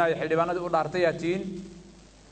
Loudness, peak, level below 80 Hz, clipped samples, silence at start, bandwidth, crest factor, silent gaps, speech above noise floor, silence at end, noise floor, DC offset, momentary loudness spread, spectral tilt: -27 LUFS; -10 dBFS; -56 dBFS; under 0.1%; 0 s; 9 kHz; 16 dB; none; 25 dB; 0.3 s; -51 dBFS; under 0.1%; 14 LU; -6 dB/octave